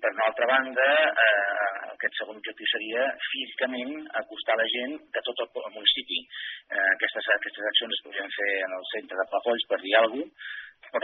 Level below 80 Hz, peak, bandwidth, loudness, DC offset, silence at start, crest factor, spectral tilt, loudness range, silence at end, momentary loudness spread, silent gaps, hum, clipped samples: -80 dBFS; -6 dBFS; 4.2 kHz; -26 LUFS; under 0.1%; 0 s; 22 dB; 3 dB/octave; 4 LU; 0 s; 12 LU; none; none; under 0.1%